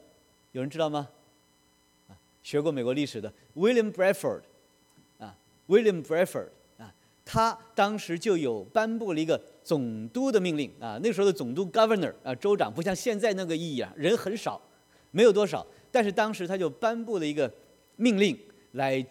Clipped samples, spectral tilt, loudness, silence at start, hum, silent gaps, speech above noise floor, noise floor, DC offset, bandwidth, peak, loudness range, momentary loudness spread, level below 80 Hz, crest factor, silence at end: under 0.1%; -5.5 dB/octave; -28 LUFS; 0.55 s; none; none; 38 dB; -65 dBFS; under 0.1%; 16.5 kHz; -8 dBFS; 3 LU; 13 LU; -66 dBFS; 20 dB; 0.05 s